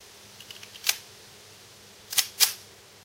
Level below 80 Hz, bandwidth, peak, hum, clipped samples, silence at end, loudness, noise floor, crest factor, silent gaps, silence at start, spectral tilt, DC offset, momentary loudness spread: -72 dBFS; 17 kHz; -2 dBFS; none; under 0.1%; 0.4 s; -25 LUFS; -51 dBFS; 30 dB; none; 0.4 s; 2 dB/octave; under 0.1%; 25 LU